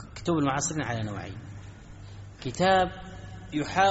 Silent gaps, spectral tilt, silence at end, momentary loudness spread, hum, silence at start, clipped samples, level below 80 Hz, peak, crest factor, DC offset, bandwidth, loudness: none; -4 dB/octave; 0 s; 22 LU; none; 0 s; under 0.1%; -50 dBFS; -10 dBFS; 18 dB; under 0.1%; 8 kHz; -28 LUFS